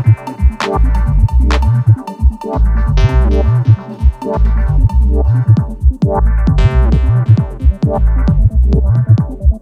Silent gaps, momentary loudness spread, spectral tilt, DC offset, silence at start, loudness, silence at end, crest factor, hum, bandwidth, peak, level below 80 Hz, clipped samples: none; 4 LU; -8.5 dB/octave; under 0.1%; 0 s; -13 LUFS; 0.05 s; 10 dB; none; 6.8 kHz; 0 dBFS; -12 dBFS; under 0.1%